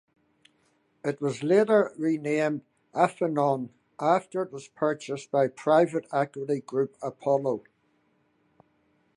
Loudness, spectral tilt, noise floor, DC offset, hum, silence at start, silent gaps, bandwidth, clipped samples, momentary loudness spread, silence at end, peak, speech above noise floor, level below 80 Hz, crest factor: -27 LUFS; -6.5 dB/octave; -69 dBFS; under 0.1%; none; 1.05 s; none; 11 kHz; under 0.1%; 11 LU; 1.6 s; -8 dBFS; 43 dB; -78 dBFS; 20 dB